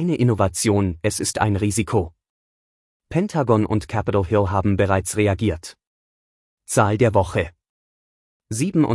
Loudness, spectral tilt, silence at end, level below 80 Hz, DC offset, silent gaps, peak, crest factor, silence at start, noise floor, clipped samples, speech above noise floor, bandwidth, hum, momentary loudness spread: -21 LUFS; -6 dB/octave; 0 s; -46 dBFS; under 0.1%; 2.30-3.00 s, 5.87-6.57 s, 7.69-8.40 s; -4 dBFS; 18 dB; 0 s; under -90 dBFS; under 0.1%; over 71 dB; 12 kHz; none; 7 LU